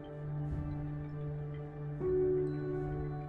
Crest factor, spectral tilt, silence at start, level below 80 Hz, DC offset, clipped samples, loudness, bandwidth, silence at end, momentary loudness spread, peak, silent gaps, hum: 12 dB; -11 dB/octave; 0 s; -50 dBFS; under 0.1%; under 0.1%; -37 LUFS; 4.3 kHz; 0 s; 10 LU; -24 dBFS; none; none